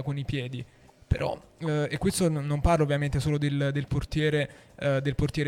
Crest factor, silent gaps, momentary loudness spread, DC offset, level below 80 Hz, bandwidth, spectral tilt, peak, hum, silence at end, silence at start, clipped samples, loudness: 18 dB; none; 8 LU; under 0.1%; -40 dBFS; 14 kHz; -6 dB/octave; -10 dBFS; none; 0 s; 0 s; under 0.1%; -28 LUFS